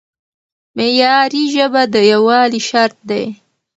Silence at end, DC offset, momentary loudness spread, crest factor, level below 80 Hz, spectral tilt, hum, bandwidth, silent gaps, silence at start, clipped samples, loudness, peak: 0.45 s; under 0.1%; 10 LU; 14 dB; -64 dBFS; -3.5 dB/octave; none; 8.2 kHz; none; 0.75 s; under 0.1%; -13 LUFS; 0 dBFS